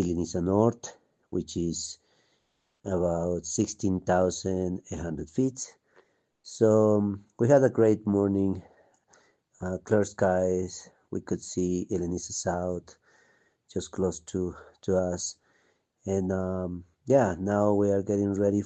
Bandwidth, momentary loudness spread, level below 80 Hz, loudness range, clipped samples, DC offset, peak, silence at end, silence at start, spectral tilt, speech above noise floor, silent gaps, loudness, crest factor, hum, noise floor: 9 kHz; 15 LU; -60 dBFS; 7 LU; under 0.1%; under 0.1%; -8 dBFS; 0 s; 0 s; -6 dB/octave; 47 dB; none; -28 LUFS; 20 dB; none; -74 dBFS